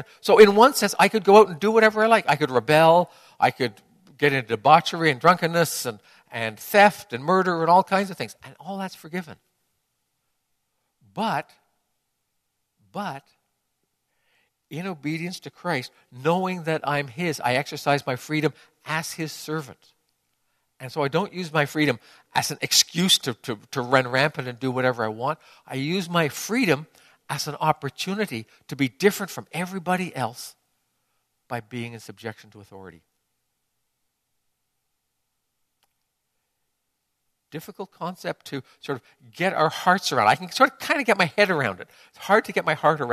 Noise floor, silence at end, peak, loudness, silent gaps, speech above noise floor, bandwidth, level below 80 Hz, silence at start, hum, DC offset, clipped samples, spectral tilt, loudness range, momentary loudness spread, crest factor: -77 dBFS; 0 s; -2 dBFS; -22 LUFS; none; 54 dB; 14 kHz; -68 dBFS; 0 s; none; under 0.1%; under 0.1%; -4 dB/octave; 16 LU; 17 LU; 22 dB